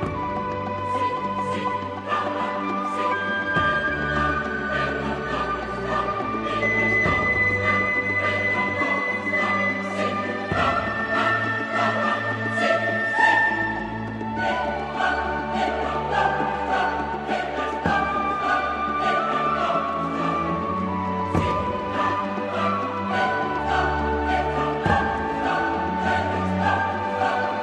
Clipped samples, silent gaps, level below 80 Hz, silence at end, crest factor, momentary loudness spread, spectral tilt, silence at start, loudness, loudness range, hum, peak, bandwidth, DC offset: under 0.1%; none; -42 dBFS; 0 s; 18 dB; 6 LU; -6 dB/octave; 0 s; -23 LUFS; 3 LU; none; -6 dBFS; 11 kHz; under 0.1%